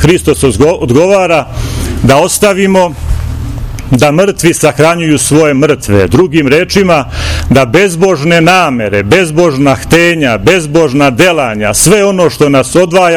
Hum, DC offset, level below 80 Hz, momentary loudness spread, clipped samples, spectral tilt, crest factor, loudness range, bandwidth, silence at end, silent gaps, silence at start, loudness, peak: none; under 0.1%; -24 dBFS; 7 LU; 6%; -5 dB/octave; 8 dB; 2 LU; over 20 kHz; 0 s; none; 0 s; -8 LUFS; 0 dBFS